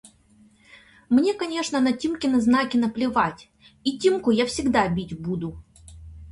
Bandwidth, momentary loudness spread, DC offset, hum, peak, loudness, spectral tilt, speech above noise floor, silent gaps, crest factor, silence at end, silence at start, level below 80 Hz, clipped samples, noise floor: 11.5 kHz; 9 LU; under 0.1%; none; -6 dBFS; -23 LUFS; -5 dB/octave; 34 dB; none; 18 dB; 0 s; 1.1 s; -50 dBFS; under 0.1%; -56 dBFS